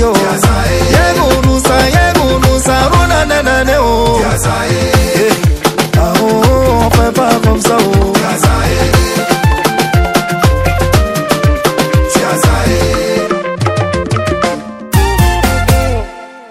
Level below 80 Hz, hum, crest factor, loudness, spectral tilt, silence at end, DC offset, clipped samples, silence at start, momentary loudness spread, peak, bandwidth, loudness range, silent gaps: -18 dBFS; none; 10 dB; -10 LUFS; -5 dB/octave; 0 s; under 0.1%; 0.4%; 0 s; 5 LU; 0 dBFS; 16.5 kHz; 3 LU; none